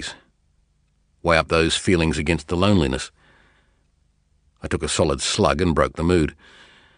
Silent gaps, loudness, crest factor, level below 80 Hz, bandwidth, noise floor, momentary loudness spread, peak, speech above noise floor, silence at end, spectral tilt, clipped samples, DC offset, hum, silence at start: none; -20 LUFS; 22 dB; -38 dBFS; 10.5 kHz; -64 dBFS; 10 LU; 0 dBFS; 44 dB; 0.65 s; -5 dB/octave; under 0.1%; under 0.1%; 50 Hz at -50 dBFS; 0 s